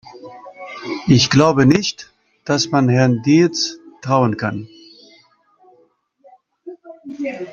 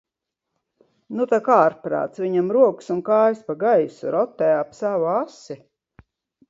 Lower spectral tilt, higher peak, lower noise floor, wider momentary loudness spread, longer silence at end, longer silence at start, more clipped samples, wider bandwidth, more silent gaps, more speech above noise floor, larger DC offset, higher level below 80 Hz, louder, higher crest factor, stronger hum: second, -5.5 dB/octave vs -7.5 dB/octave; about the same, -2 dBFS vs -2 dBFS; second, -57 dBFS vs -82 dBFS; first, 25 LU vs 12 LU; second, 0 s vs 0.95 s; second, 0.15 s vs 1.1 s; neither; about the same, 7.4 kHz vs 7.8 kHz; neither; second, 42 dB vs 62 dB; neither; first, -52 dBFS vs -68 dBFS; first, -16 LUFS vs -20 LUFS; about the same, 18 dB vs 20 dB; neither